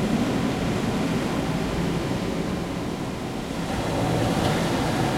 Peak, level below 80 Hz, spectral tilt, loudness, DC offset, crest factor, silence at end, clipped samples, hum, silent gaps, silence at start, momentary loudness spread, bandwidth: -8 dBFS; -40 dBFS; -6 dB/octave; -25 LUFS; under 0.1%; 16 dB; 0 s; under 0.1%; none; none; 0 s; 6 LU; 16.5 kHz